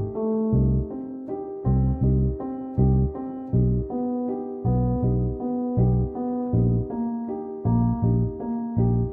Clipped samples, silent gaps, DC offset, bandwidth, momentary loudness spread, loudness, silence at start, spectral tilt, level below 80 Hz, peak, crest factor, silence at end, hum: under 0.1%; none; under 0.1%; 2 kHz; 8 LU; -25 LUFS; 0 s; -15.5 dB/octave; -32 dBFS; -10 dBFS; 14 dB; 0 s; none